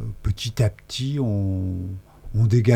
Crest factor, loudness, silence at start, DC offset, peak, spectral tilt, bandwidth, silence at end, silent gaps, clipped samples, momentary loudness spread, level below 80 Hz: 16 dB; -24 LUFS; 0 s; under 0.1%; -6 dBFS; -7 dB/octave; 14 kHz; 0 s; none; under 0.1%; 10 LU; -40 dBFS